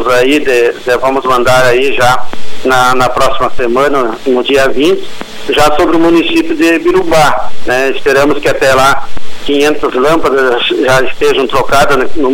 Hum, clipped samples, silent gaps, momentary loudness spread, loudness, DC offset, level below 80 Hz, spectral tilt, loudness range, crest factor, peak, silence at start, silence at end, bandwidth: none; under 0.1%; none; 6 LU; -9 LUFS; under 0.1%; -30 dBFS; -4 dB/octave; 1 LU; 8 dB; 0 dBFS; 0 s; 0 s; 17.5 kHz